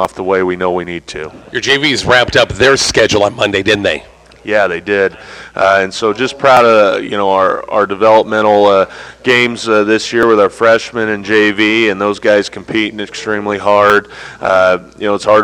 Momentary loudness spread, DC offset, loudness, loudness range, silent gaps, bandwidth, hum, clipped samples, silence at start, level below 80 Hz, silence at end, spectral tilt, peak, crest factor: 10 LU; under 0.1%; -11 LUFS; 3 LU; none; 14.5 kHz; none; under 0.1%; 0 s; -42 dBFS; 0 s; -4 dB/octave; 0 dBFS; 12 dB